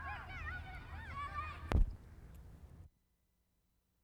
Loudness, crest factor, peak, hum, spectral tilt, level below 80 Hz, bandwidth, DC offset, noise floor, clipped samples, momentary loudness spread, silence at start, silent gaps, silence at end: -43 LUFS; 28 dB; -14 dBFS; none; -6.5 dB/octave; -44 dBFS; 9.4 kHz; under 0.1%; -80 dBFS; under 0.1%; 21 LU; 0 s; none; 1.15 s